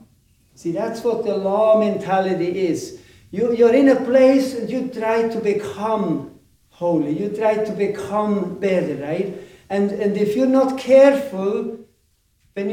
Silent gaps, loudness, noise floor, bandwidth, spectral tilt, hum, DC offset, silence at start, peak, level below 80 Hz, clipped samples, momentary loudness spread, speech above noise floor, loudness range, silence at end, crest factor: none; -19 LUFS; -63 dBFS; 15 kHz; -6.5 dB/octave; none; under 0.1%; 0.65 s; -2 dBFS; -60 dBFS; under 0.1%; 13 LU; 45 dB; 4 LU; 0 s; 18 dB